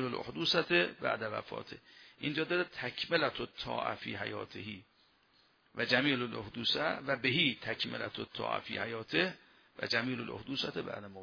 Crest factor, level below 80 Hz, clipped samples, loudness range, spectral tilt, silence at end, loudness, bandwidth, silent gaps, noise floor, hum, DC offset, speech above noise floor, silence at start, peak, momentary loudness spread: 24 dB; -70 dBFS; under 0.1%; 4 LU; -5 dB/octave; 0 s; -34 LUFS; 5.4 kHz; none; -69 dBFS; none; under 0.1%; 34 dB; 0 s; -12 dBFS; 14 LU